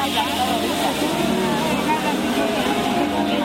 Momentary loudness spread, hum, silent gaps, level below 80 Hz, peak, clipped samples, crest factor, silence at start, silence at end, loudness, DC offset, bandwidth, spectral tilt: 1 LU; none; none; -46 dBFS; -6 dBFS; under 0.1%; 14 dB; 0 s; 0 s; -20 LUFS; under 0.1%; 16.5 kHz; -4 dB/octave